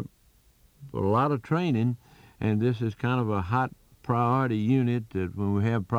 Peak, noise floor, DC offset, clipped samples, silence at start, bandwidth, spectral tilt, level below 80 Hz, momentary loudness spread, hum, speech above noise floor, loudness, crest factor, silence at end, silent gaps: -12 dBFS; -61 dBFS; under 0.1%; under 0.1%; 0 s; 7.8 kHz; -9 dB/octave; -58 dBFS; 8 LU; none; 36 dB; -27 LUFS; 16 dB; 0 s; none